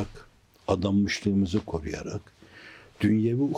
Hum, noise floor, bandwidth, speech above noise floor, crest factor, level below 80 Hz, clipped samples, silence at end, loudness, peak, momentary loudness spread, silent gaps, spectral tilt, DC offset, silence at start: none; -54 dBFS; 10 kHz; 29 dB; 18 dB; -52 dBFS; under 0.1%; 0 s; -27 LUFS; -10 dBFS; 23 LU; none; -6.5 dB/octave; under 0.1%; 0 s